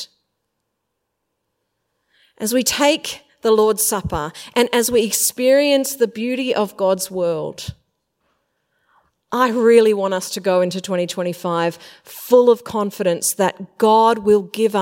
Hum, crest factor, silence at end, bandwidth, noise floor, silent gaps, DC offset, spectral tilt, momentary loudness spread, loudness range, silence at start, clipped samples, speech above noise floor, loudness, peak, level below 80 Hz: none; 18 dB; 0 s; 16.5 kHz; -76 dBFS; none; under 0.1%; -3.5 dB/octave; 12 LU; 6 LU; 0 s; under 0.1%; 58 dB; -17 LUFS; 0 dBFS; -52 dBFS